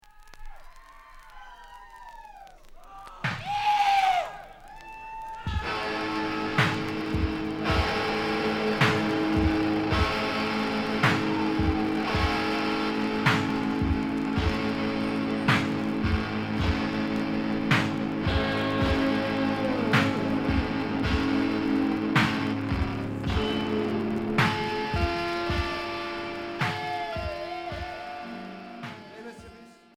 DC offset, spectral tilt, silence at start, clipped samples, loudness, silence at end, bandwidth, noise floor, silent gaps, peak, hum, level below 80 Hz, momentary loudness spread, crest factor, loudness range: under 0.1%; -6 dB/octave; 0.2 s; under 0.1%; -27 LUFS; 0.25 s; 16 kHz; -50 dBFS; none; -8 dBFS; none; -40 dBFS; 15 LU; 18 dB; 5 LU